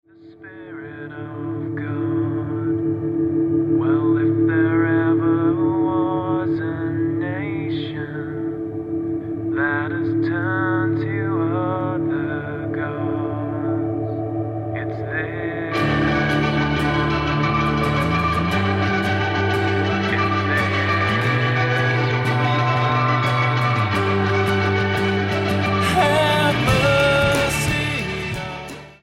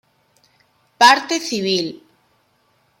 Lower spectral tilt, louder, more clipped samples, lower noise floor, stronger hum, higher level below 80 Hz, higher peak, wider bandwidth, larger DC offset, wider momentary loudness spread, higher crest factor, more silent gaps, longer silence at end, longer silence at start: first, -6.5 dB/octave vs -2 dB/octave; second, -20 LUFS vs -16 LUFS; neither; second, -42 dBFS vs -62 dBFS; neither; first, -42 dBFS vs -70 dBFS; second, -4 dBFS vs 0 dBFS; about the same, 15 kHz vs 16.5 kHz; neither; about the same, 9 LU vs 10 LU; about the same, 16 dB vs 20 dB; neither; second, 0.1 s vs 1.05 s; second, 0.2 s vs 1 s